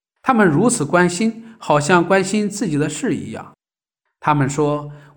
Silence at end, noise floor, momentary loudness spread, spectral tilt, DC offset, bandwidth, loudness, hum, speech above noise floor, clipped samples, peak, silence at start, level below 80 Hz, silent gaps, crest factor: 0.15 s; -84 dBFS; 11 LU; -5.5 dB/octave; under 0.1%; 20 kHz; -17 LUFS; none; 67 dB; under 0.1%; -2 dBFS; 0.25 s; -52 dBFS; none; 16 dB